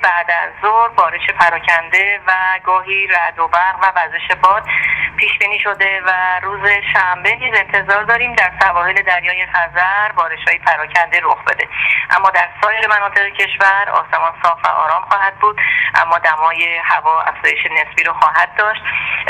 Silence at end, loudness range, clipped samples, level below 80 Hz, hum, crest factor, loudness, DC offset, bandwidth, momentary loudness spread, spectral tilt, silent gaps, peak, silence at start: 0 s; 1 LU; under 0.1%; -48 dBFS; none; 14 dB; -13 LUFS; under 0.1%; 12.5 kHz; 3 LU; -2.5 dB/octave; none; 0 dBFS; 0 s